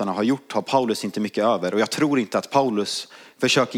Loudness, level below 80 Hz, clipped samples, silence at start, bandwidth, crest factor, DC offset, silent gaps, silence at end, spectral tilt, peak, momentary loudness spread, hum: -22 LUFS; -76 dBFS; under 0.1%; 0 s; 16.5 kHz; 18 dB; under 0.1%; none; 0 s; -4.5 dB/octave; -4 dBFS; 5 LU; none